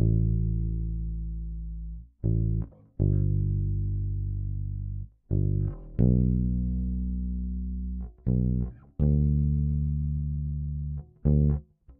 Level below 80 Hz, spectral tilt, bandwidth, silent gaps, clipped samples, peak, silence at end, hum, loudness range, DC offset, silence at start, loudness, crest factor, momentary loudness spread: -32 dBFS; -16 dB/octave; 1.6 kHz; none; under 0.1%; -10 dBFS; 0.05 s; none; 2 LU; under 0.1%; 0 s; -29 LUFS; 18 dB; 12 LU